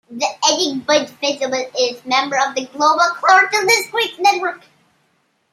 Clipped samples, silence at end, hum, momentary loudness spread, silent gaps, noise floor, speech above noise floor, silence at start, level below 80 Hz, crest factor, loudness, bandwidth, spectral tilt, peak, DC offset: under 0.1%; 0.95 s; none; 9 LU; none; -63 dBFS; 47 dB; 0.1 s; -72 dBFS; 16 dB; -16 LUFS; 15.5 kHz; -0.5 dB/octave; 0 dBFS; under 0.1%